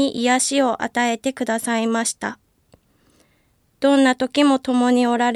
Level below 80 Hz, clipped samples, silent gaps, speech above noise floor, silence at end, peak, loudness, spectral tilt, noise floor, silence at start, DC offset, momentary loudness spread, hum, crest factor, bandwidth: -64 dBFS; under 0.1%; none; 43 dB; 0 s; -4 dBFS; -19 LUFS; -2.5 dB/octave; -62 dBFS; 0 s; under 0.1%; 7 LU; none; 16 dB; 13.5 kHz